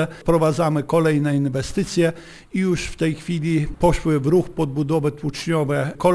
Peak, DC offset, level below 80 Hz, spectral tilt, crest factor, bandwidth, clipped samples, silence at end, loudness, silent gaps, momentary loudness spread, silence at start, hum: -4 dBFS; under 0.1%; -36 dBFS; -6.5 dB/octave; 16 dB; 11 kHz; under 0.1%; 0 s; -21 LUFS; none; 6 LU; 0 s; none